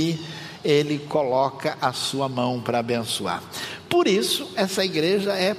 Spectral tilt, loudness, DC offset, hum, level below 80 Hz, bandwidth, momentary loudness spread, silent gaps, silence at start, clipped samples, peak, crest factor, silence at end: -4.5 dB/octave; -23 LUFS; under 0.1%; none; -68 dBFS; 15.5 kHz; 9 LU; none; 0 s; under 0.1%; -6 dBFS; 18 dB; 0 s